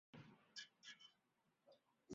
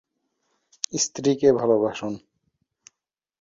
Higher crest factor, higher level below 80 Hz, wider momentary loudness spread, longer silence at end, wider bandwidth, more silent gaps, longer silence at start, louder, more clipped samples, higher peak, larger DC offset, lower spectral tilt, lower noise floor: about the same, 22 dB vs 22 dB; second, under -90 dBFS vs -64 dBFS; second, 7 LU vs 14 LU; second, 0 s vs 1.25 s; about the same, 7.4 kHz vs 7.8 kHz; neither; second, 0.15 s vs 0.9 s; second, -61 LUFS vs -23 LUFS; neither; second, -42 dBFS vs -4 dBFS; neither; second, -2.5 dB/octave vs -4 dB/octave; about the same, -86 dBFS vs -83 dBFS